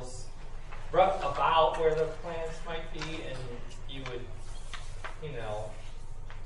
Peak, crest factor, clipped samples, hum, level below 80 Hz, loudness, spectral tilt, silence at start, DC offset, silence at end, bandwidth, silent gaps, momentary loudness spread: -10 dBFS; 22 dB; under 0.1%; none; -42 dBFS; -31 LUFS; -4.5 dB/octave; 0 s; under 0.1%; 0 s; 11 kHz; none; 21 LU